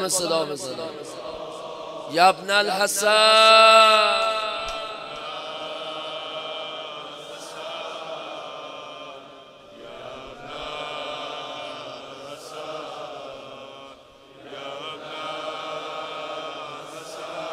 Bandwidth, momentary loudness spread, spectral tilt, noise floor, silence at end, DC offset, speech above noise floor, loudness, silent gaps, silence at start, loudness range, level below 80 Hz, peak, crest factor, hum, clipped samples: 16 kHz; 22 LU; -1 dB/octave; -48 dBFS; 0 s; under 0.1%; 30 dB; -21 LUFS; none; 0 s; 20 LU; -62 dBFS; -2 dBFS; 22 dB; none; under 0.1%